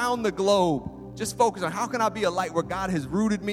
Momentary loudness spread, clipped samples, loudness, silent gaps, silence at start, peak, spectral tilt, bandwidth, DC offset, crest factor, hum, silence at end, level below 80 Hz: 9 LU; under 0.1%; -26 LUFS; none; 0 s; -8 dBFS; -5 dB/octave; 16.5 kHz; under 0.1%; 16 dB; none; 0 s; -52 dBFS